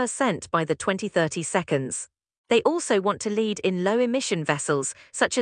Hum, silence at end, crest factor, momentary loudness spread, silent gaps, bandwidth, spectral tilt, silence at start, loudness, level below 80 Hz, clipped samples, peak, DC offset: none; 0 s; 20 dB; 4 LU; 2.38-2.44 s; 10.5 kHz; -4 dB/octave; 0 s; -25 LUFS; -68 dBFS; under 0.1%; -4 dBFS; under 0.1%